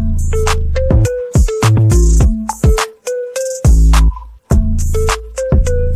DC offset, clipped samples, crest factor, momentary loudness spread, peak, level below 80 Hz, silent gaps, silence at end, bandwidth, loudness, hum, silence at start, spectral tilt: under 0.1%; under 0.1%; 10 dB; 9 LU; 0 dBFS; -14 dBFS; none; 0 s; 14 kHz; -14 LUFS; none; 0 s; -6 dB/octave